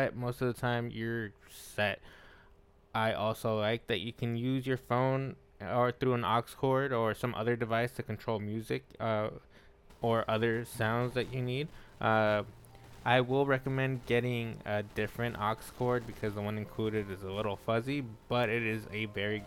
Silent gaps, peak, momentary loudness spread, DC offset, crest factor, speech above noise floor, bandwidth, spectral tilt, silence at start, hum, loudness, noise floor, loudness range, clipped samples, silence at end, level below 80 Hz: none; -12 dBFS; 8 LU; under 0.1%; 20 dB; 29 dB; 16.5 kHz; -6.5 dB/octave; 0 s; none; -33 LUFS; -61 dBFS; 4 LU; under 0.1%; 0 s; -60 dBFS